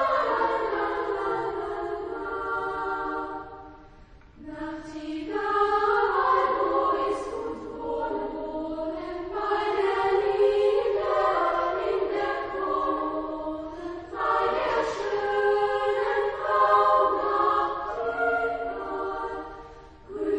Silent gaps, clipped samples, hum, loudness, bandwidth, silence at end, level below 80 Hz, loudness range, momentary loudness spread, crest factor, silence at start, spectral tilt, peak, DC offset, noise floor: none; under 0.1%; none; -26 LUFS; 9.4 kHz; 0 s; -52 dBFS; 7 LU; 13 LU; 18 dB; 0 s; -5 dB/octave; -10 dBFS; under 0.1%; -50 dBFS